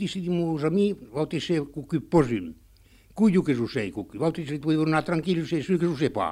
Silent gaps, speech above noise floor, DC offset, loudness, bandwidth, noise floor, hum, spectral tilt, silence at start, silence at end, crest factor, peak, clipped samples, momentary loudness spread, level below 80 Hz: none; 30 dB; under 0.1%; -26 LUFS; 12 kHz; -55 dBFS; none; -7 dB/octave; 0 s; 0 s; 18 dB; -6 dBFS; under 0.1%; 8 LU; -54 dBFS